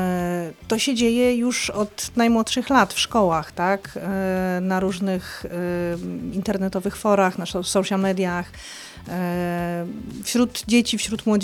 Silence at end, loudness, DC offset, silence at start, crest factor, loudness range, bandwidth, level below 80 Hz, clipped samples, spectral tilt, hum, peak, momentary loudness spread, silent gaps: 0 s; -22 LUFS; under 0.1%; 0 s; 20 dB; 4 LU; 18 kHz; -48 dBFS; under 0.1%; -4.5 dB/octave; none; -2 dBFS; 10 LU; none